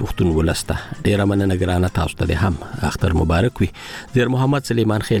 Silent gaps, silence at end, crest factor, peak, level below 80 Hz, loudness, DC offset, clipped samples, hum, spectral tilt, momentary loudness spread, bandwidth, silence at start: none; 0 s; 12 dB; -6 dBFS; -32 dBFS; -19 LUFS; under 0.1%; under 0.1%; none; -6.5 dB/octave; 6 LU; 17 kHz; 0 s